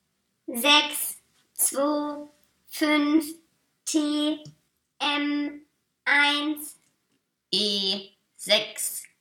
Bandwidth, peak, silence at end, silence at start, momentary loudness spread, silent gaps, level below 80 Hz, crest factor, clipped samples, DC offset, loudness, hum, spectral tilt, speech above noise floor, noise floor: 19 kHz; -6 dBFS; 0.15 s; 0.5 s; 18 LU; none; -76 dBFS; 20 dB; under 0.1%; under 0.1%; -24 LUFS; none; -1 dB/octave; 50 dB; -75 dBFS